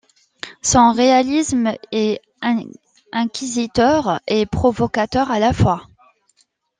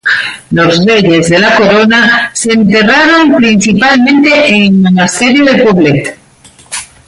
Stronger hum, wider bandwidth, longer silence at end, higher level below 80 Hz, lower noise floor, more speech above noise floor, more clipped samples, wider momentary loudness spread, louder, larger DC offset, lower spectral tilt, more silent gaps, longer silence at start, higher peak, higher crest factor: neither; second, 9.8 kHz vs 11.5 kHz; first, 0.95 s vs 0.25 s; about the same, -42 dBFS vs -42 dBFS; first, -62 dBFS vs -39 dBFS; first, 45 dB vs 33 dB; neither; first, 10 LU vs 6 LU; second, -18 LUFS vs -6 LUFS; neither; about the same, -4.5 dB/octave vs -4.5 dB/octave; neither; first, 0.45 s vs 0.05 s; about the same, -2 dBFS vs 0 dBFS; first, 16 dB vs 6 dB